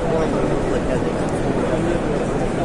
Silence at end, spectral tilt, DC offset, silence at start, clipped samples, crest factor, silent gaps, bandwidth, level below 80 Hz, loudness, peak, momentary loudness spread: 0 s; -7 dB/octave; under 0.1%; 0 s; under 0.1%; 12 dB; none; 11.5 kHz; -30 dBFS; -21 LUFS; -6 dBFS; 2 LU